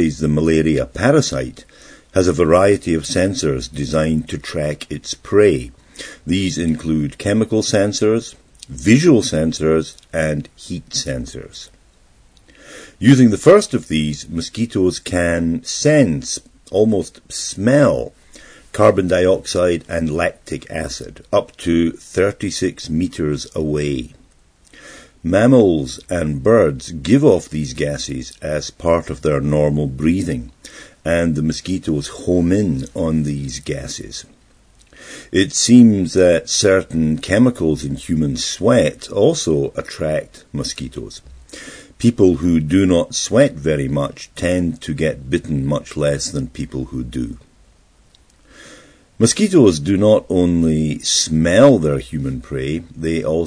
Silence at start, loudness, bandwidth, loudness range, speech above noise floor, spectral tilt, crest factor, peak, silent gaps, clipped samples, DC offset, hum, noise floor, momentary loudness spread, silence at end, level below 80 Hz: 0 s; -17 LUFS; 10.5 kHz; 6 LU; 35 dB; -5.5 dB/octave; 16 dB; 0 dBFS; none; under 0.1%; under 0.1%; none; -52 dBFS; 14 LU; 0 s; -38 dBFS